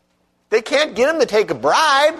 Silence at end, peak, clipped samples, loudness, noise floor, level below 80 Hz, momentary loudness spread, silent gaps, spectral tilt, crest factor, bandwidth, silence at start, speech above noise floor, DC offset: 0 s; -4 dBFS; under 0.1%; -16 LUFS; -64 dBFS; -58 dBFS; 6 LU; none; -2.5 dB/octave; 14 dB; 13.5 kHz; 0.5 s; 48 dB; under 0.1%